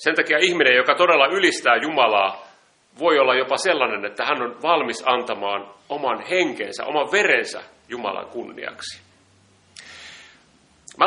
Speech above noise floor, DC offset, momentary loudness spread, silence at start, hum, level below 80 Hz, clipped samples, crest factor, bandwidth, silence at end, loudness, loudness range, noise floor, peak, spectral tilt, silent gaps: 36 dB; under 0.1%; 19 LU; 0 s; none; -70 dBFS; under 0.1%; 22 dB; 10.5 kHz; 0 s; -19 LUFS; 9 LU; -57 dBFS; 0 dBFS; -2.5 dB/octave; none